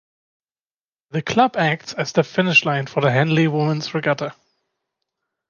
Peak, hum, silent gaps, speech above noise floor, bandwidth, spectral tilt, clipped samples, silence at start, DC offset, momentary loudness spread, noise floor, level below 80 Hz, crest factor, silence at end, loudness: -2 dBFS; none; none; over 71 dB; 7.2 kHz; -5.5 dB/octave; under 0.1%; 1.15 s; under 0.1%; 10 LU; under -90 dBFS; -62 dBFS; 18 dB; 1.15 s; -19 LUFS